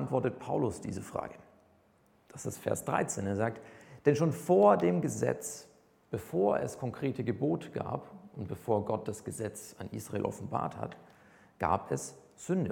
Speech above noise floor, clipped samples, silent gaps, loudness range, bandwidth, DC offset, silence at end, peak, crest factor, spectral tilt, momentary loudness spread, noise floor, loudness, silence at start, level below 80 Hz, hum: 35 dB; under 0.1%; none; 7 LU; 18 kHz; under 0.1%; 0 s; -10 dBFS; 22 dB; -6.5 dB/octave; 15 LU; -67 dBFS; -33 LUFS; 0 s; -64 dBFS; none